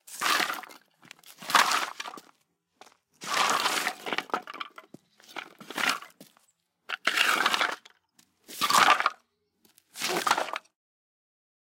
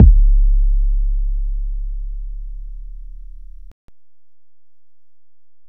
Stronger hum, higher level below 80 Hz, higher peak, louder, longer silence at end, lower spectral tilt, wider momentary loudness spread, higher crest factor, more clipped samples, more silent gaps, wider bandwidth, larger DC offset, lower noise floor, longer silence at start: neither; second, -86 dBFS vs -16 dBFS; second, -4 dBFS vs 0 dBFS; second, -26 LUFS vs -21 LUFS; second, 1.1 s vs 2 s; second, 0 dB/octave vs -12.5 dB/octave; second, 20 LU vs 23 LU; first, 28 dB vs 16 dB; neither; neither; first, 17 kHz vs 0.5 kHz; second, under 0.1% vs 2%; second, -73 dBFS vs -88 dBFS; about the same, 0.1 s vs 0 s